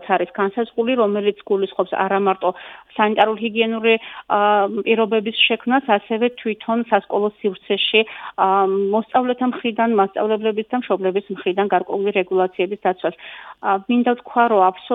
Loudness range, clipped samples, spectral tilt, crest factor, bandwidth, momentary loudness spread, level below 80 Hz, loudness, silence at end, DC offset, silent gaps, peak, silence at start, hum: 3 LU; under 0.1%; -8 dB/octave; 18 dB; 4 kHz; 6 LU; -68 dBFS; -19 LUFS; 0 s; under 0.1%; none; 0 dBFS; 0 s; none